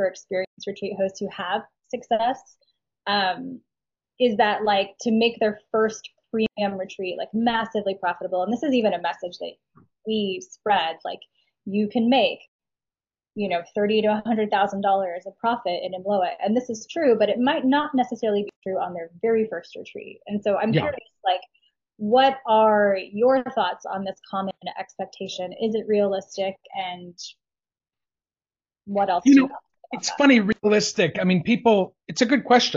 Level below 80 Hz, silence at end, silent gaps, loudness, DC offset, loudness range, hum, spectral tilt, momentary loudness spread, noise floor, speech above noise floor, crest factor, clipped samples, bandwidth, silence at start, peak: -66 dBFS; 0 s; 0.47-0.57 s, 12.48-12.59 s, 18.56-18.62 s; -23 LUFS; under 0.1%; 7 LU; none; -3.5 dB/octave; 15 LU; under -90 dBFS; over 67 dB; 20 dB; under 0.1%; 7.6 kHz; 0 s; -4 dBFS